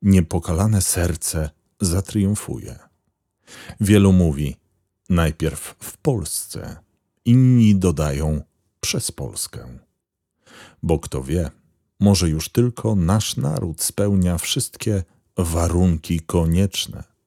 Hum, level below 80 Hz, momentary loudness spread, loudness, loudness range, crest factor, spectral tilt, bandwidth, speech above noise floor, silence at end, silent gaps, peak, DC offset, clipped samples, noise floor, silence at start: none; -36 dBFS; 14 LU; -20 LUFS; 5 LU; 18 dB; -5.5 dB/octave; 16.5 kHz; 57 dB; 0.25 s; none; -2 dBFS; under 0.1%; under 0.1%; -76 dBFS; 0 s